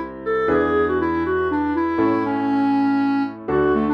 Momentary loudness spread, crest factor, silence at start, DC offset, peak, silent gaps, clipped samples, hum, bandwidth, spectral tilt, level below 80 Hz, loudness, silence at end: 3 LU; 12 dB; 0 s; under 0.1%; -6 dBFS; none; under 0.1%; none; 5.6 kHz; -8.5 dB/octave; -44 dBFS; -20 LUFS; 0 s